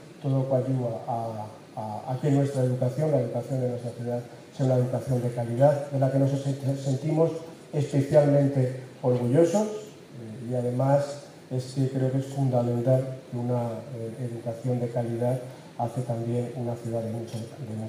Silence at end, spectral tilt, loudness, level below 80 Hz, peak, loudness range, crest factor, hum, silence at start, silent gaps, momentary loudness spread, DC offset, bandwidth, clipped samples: 0 s; -8 dB/octave; -27 LUFS; -66 dBFS; -6 dBFS; 6 LU; 20 dB; none; 0 s; none; 13 LU; under 0.1%; 12 kHz; under 0.1%